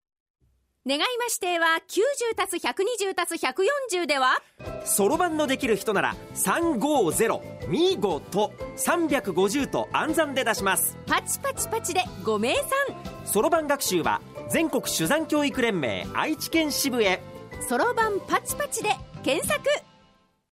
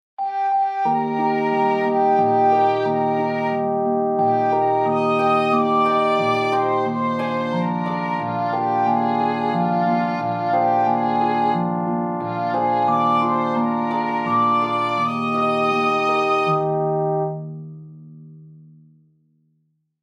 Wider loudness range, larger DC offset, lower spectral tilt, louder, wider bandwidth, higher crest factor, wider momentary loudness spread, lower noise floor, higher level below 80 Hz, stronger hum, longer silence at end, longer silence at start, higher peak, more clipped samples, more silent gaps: about the same, 1 LU vs 3 LU; neither; second, -3 dB/octave vs -7.5 dB/octave; second, -25 LUFS vs -20 LUFS; first, 16 kHz vs 9.8 kHz; about the same, 18 dB vs 14 dB; about the same, 5 LU vs 6 LU; second, -61 dBFS vs -68 dBFS; first, -54 dBFS vs -68 dBFS; neither; second, 0.75 s vs 1.4 s; first, 0.85 s vs 0.2 s; about the same, -8 dBFS vs -6 dBFS; neither; neither